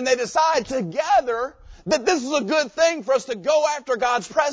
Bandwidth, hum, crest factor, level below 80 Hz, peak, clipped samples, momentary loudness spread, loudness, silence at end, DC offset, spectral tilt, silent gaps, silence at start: 8 kHz; none; 16 dB; -54 dBFS; -4 dBFS; under 0.1%; 6 LU; -21 LUFS; 0 s; under 0.1%; -3 dB/octave; none; 0 s